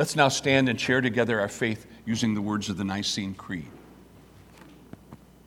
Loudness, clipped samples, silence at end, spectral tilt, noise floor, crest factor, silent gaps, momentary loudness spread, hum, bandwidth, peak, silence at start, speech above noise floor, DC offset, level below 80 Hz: -26 LUFS; under 0.1%; 0.3 s; -4.5 dB/octave; -51 dBFS; 24 dB; none; 14 LU; none; 16.5 kHz; -4 dBFS; 0 s; 26 dB; under 0.1%; -58 dBFS